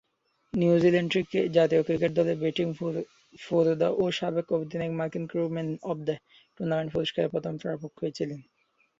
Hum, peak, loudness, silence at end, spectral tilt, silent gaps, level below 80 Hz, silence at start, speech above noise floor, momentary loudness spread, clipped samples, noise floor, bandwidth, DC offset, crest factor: none; -8 dBFS; -28 LUFS; 0.6 s; -7 dB/octave; none; -64 dBFS; 0.55 s; 46 dB; 12 LU; under 0.1%; -73 dBFS; 7.6 kHz; under 0.1%; 20 dB